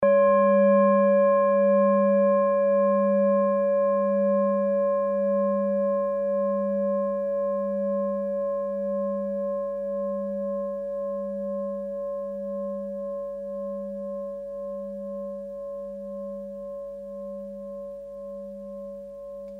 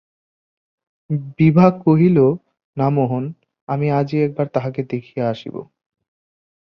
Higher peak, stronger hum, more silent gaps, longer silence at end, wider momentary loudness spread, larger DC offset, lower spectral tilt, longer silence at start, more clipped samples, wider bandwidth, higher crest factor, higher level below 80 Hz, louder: second, -10 dBFS vs -2 dBFS; first, 50 Hz at -35 dBFS vs none; second, none vs 2.64-2.73 s, 3.61-3.67 s; second, 0 s vs 1.05 s; about the same, 17 LU vs 16 LU; neither; about the same, -10.5 dB/octave vs -10.5 dB/octave; second, 0 s vs 1.1 s; neither; second, 3.3 kHz vs 6 kHz; about the same, 14 dB vs 18 dB; second, -62 dBFS vs -54 dBFS; second, -25 LUFS vs -18 LUFS